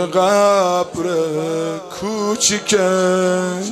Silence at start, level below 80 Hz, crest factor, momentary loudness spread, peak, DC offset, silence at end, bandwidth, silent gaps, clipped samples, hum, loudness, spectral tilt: 0 s; -58 dBFS; 14 dB; 9 LU; -2 dBFS; under 0.1%; 0 s; 15.5 kHz; none; under 0.1%; none; -17 LUFS; -3.5 dB/octave